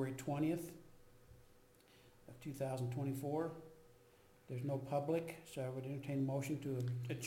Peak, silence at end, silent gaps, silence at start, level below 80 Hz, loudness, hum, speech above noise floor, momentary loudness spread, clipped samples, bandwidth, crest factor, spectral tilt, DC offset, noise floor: -28 dBFS; 0 s; none; 0 s; -72 dBFS; -42 LUFS; none; 26 dB; 14 LU; under 0.1%; 16.5 kHz; 16 dB; -7 dB/octave; under 0.1%; -67 dBFS